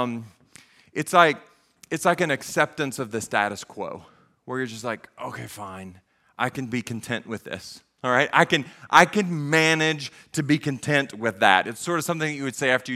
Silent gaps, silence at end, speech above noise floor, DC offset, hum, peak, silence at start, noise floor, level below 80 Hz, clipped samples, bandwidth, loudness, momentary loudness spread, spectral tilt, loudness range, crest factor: none; 0 s; 29 dB; under 0.1%; none; 0 dBFS; 0 s; -53 dBFS; -66 dBFS; under 0.1%; 16 kHz; -23 LUFS; 17 LU; -4 dB/octave; 11 LU; 24 dB